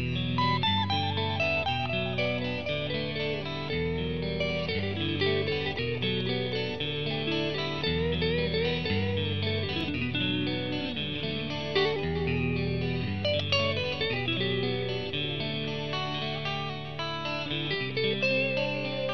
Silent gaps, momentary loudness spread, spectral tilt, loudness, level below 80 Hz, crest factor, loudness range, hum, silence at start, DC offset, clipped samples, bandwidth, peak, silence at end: none; 5 LU; -6.5 dB/octave; -29 LUFS; -50 dBFS; 18 dB; 2 LU; none; 0 s; 0.5%; under 0.1%; 6.6 kHz; -10 dBFS; 0 s